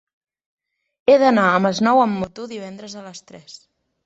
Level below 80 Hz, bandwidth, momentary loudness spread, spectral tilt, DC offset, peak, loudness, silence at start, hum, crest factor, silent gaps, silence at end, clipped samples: -58 dBFS; 8 kHz; 21 LU; -5.5 dB/octave; under 0.1%; -4 dBFS; -17 LUFS; 1.1 s; none; 16 dB; none; 0.7 s; under 0.1%